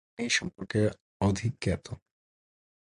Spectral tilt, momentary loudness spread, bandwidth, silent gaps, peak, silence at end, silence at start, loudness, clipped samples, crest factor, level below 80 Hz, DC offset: -4.5 dB/octave; 9 LU; 11 kHz; 1.01-1.20 s; -14 dBFS; 0.9 s; 0.2 s; -30 LUFS; under 0.1%; 18 dB; -50 dBFS; under 0.1%